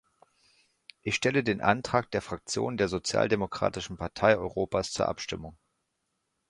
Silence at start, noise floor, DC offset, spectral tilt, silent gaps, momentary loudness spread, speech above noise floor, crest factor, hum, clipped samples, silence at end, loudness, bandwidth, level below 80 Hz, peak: 1.05 s; -80 dBFS; under 0.1%; -4.5 dB/octave; none; 11 LU; 51 dB; 24 dB; none; under 0.1%; 0.95 s; -29 LUFS; 11.5 kHz; -54 dBFS; -6 dBFS